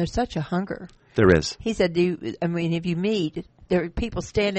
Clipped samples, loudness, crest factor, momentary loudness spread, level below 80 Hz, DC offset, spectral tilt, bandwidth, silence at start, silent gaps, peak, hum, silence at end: under 0.1%; -24 LUFS; 20 dB; 11 LU; -42 dBFS; under 0.1%; -6 dB/octave; 8.4 kHz; 0 s; none; -4 dBFS; none; 0 s